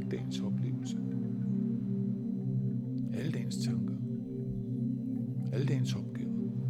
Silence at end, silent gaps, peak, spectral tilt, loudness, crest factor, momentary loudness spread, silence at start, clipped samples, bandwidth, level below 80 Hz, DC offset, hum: 0 s; none; -20 dBFS; -7.5 dB/octave; -35 LUFS; 14 dB; 4 LU; 0 s; under 0.1%; 11.5 kHz; -62 dBFS; under 0.1%; none